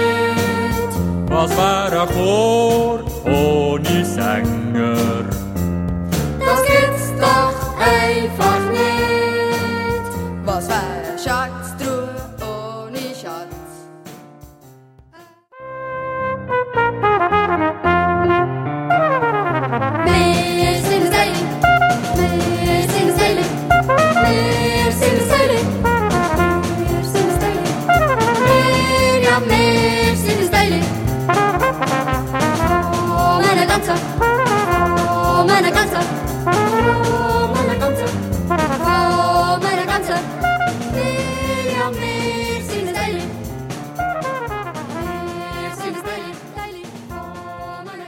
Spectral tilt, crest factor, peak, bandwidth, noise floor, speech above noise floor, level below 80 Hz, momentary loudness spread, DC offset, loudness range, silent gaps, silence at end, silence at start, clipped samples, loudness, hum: -5 dB/octave; 16 dB; 0 dBFS; 17 kHz; -47 dBFS; 31 dB; -34 dBFS; 13 LU; under 0.1%; 10 LU; none; 0 s; 0 s; under 0.1%; -17 LUFS; none